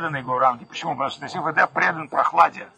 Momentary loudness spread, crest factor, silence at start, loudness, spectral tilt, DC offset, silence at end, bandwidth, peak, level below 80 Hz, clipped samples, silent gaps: 9 LU; 18 dB; 0 s; -21 LUFS; -4.5 dB/octave; under 0.1%; 0.1 s; 9.6 kHz; -4 dBFS; -68 dBFS; under 0.1%; none